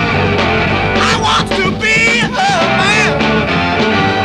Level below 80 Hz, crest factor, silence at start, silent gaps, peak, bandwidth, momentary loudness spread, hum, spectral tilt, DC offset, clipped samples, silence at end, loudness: -32 dBFS; 12 dB; 0 s; none; 0 dBFS; 12.5 kHz; 3 LU; none; -4.5 dB/octave; under 0.1%; under 0.1%; 0 s; -11 LUFS